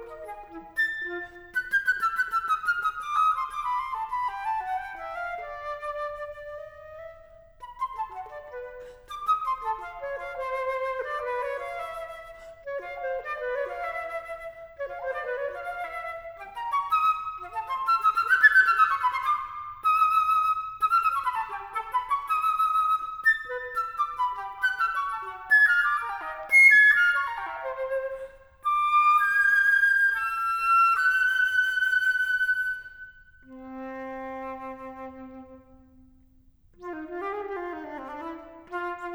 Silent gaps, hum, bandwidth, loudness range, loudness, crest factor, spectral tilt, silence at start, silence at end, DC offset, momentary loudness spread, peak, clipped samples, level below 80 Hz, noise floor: none; none; over 20 kHz; 17 LU; -24 LUFS; 20 dB; -2 dB/octave; 0 s; 0 s; under 0.1%; 20 LU; -6 dBFS; under 0.1%; -58 dBFS; -58 dBFS